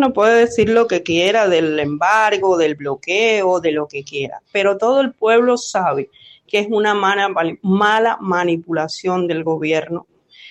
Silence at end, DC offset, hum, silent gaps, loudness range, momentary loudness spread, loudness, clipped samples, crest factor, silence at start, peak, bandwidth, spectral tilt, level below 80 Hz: 0 s; under 0.1%; none; none; 3 LU; 9 LU; -16 LUFS; under 0.1%; 14 dB; 0 s; -2 dBFS; 9.8 kHz; -4.5 dB/octave; -56 dBFS